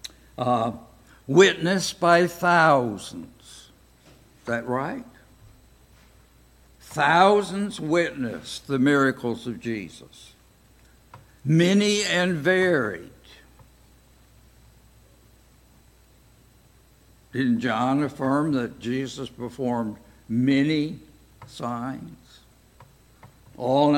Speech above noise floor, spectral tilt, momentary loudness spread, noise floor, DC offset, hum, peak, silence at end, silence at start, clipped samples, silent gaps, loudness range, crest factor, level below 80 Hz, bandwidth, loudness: 33 dB; -5 dB/octave; 20 LU; -56 dBFS; under 0.1%; none; -4 dBFS; 0 s; 0.05 s; under 0.1%; none; 11 LU; 22 dB; -58 dBFS; 17 kHz; -23 LUFS